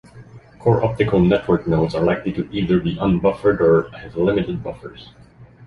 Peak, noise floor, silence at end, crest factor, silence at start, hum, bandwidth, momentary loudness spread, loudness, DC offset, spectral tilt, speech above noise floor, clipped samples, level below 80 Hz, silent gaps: -2 dBFS; -42 dBFS; 0 s; 16 dB; 0.15 s; none; 6.6 kHz; 11 LU; -19 LUFS; under 0.1%; -9 dB/octave; 24 dB; under 0.1%; -40 dBFS; none